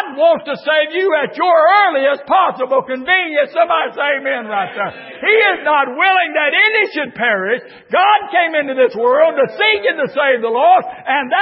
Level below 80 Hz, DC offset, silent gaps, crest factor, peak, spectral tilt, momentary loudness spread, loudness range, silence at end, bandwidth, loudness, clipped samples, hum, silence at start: -66 dBFS; under 0.1%; none; 14 dB; 0 dBFS; -8.5 dB/octave; 7 LU; 2 LU; 0 s; 5.8 kHz; -14 LUFS; under 0.1%; none; 0 s